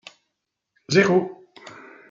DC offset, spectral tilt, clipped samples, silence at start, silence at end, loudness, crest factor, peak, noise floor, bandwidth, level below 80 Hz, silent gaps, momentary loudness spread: under 0.1%; -5.5 dB/octave; under 0.1%; 0.9 s; 0.4 s; -20 LUFS; 22 dB; -2 dBFS; -80 dBFS; 7.6 kHz; -68 dBFS; none; 25 LU